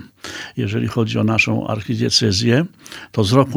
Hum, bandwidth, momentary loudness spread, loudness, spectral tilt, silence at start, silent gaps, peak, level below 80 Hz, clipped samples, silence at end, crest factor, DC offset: none; over 20 kHz; 13 LU; -18 LUFS; -5 dB/octave; 0 s; none; 0 dBFS; -50 dBFS; under 0.1%; 0 s; 18 dB; under 0.1%